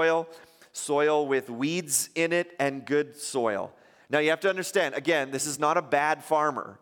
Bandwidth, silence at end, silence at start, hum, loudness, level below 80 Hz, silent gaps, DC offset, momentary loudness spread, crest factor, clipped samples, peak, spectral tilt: 17 kHz; 0.1 s; 0 s; none; -27 LUFS; -78 dBFS; none; under 0.1%; 6 LU; 18 dB; under 0.1%; -8 dBFS; -3 dB/octave